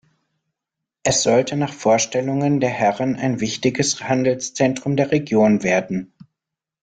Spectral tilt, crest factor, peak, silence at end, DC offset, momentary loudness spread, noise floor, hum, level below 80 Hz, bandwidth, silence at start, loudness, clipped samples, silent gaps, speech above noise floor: -4.5 dB/octave; 16 dB; -4 dBFS; 0.75 s; under 0.1%; 6 LU; -85 dBFS; none; -56 dBFS; 9.6 kHz; 1.05 s; -19 LUFS; under 0.1%; none; 66 dB